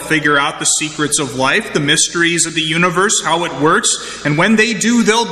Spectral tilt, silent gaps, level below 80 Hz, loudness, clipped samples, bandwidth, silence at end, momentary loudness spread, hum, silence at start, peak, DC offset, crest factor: -2.5 dB/octave; none; -50 dBFS; -13 LUFS; under 0.1%; 14 kHz; 0 s; 4 LU; none; 0 s; 0 dBFS; 0.2%; 14 dB